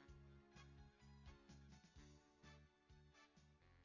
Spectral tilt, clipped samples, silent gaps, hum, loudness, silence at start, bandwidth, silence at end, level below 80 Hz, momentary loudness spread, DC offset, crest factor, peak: -5 dB/octave; under 0.1%; none; none; -67 LUFS; 0 s; 7.2 kHz; 0 s; -72 dBFS; 3 LU; under 0.1%; 16 dB; -50 dBFS